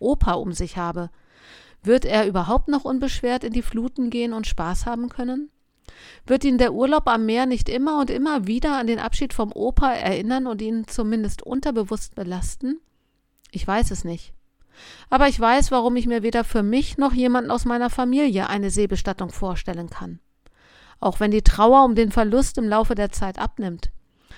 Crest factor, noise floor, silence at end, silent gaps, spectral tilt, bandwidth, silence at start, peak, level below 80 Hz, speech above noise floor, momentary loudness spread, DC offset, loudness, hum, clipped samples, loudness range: 22 dB; -67 dBFS; 0 s; none; -5.5 dB/octave; 15 kHz; 0 s; 0 dBFS; -30 dBFS; 46 dB; 12 LU; under 0.1%; -22 LUFS; none; under 0.1%; 7 LU